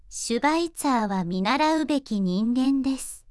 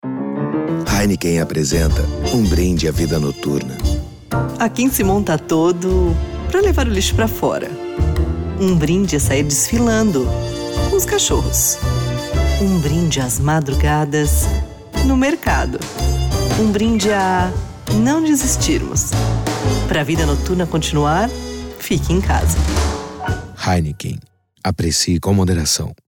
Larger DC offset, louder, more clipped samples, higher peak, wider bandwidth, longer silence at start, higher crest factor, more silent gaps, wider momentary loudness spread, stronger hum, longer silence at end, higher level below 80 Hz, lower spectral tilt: neither; second, -24 LUFS vs -17 LUFS; neither; second, -10 dBFS vs -6 dBFS; second, 12 kHz vs 19 kHz; about the same, 0.1 s vs 0.05 s; about the same, 14 dB vs 10 dB; neither; about the same, 5 LU vs 7 LU; neither; about the same, 0.1 s vs 0.15 s; second, -52 dBFS vs -24 dBFS; about the same, -5 dB/octave vs -5 dB/octave